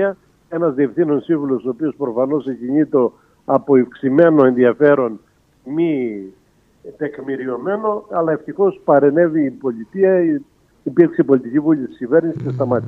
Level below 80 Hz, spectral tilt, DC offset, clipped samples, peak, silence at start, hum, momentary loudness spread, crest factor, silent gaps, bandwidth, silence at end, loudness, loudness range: -62 dBFS; -10 dB/octave; under 0.1%; under 0.1%; 0 dBFS; 0 s; none; 12 LU; 16 dB; none; 4 kHz; 0 s; -17 LUFS; 6 LU